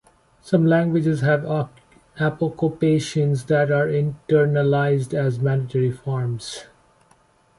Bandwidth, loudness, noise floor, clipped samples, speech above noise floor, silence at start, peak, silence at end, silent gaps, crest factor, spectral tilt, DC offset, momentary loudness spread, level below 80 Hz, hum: 11.5 kHz; -21 LUFS; -58 dBFS; under 0.1%; 38 dB; 0.45 s; -4 dBFS; 0.95 s; none; 16 dB; -7.5 dB/octave; under 0.1%; 8 LU; -56 dBFS; none